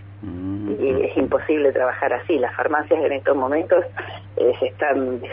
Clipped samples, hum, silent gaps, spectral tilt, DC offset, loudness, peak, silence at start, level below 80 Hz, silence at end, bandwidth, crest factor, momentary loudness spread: under 0.1%; none; none; -10.5 dB/octave; under 0.1%; -21 LUFS; -4 dBFS; 0 s; -52 dBFS; 0 s; 3.8 kHz; 16 dB; 10 LU